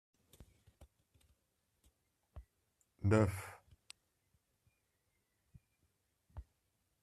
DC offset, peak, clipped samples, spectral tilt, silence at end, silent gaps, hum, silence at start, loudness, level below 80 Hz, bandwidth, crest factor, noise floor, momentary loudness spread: under 0.1%; -18 dBFS; under 0.1%; -7.5 dB/octave; 0.6 s; none; none; 2.35 s; -35 LUFS; -66 dBFS; 13.5 kHz; 26 dB; -82 dBFS; 28 LU